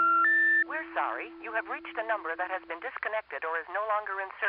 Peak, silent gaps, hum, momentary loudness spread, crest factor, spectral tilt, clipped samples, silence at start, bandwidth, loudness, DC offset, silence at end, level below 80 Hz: -16 dBFS; none; none; 13 LU; 14 dB; 1 dB/octave; under 0.1%; 0 s; 5.2 kHz; -29 LUFS; under 0.1%; 0 s; -74 dBFS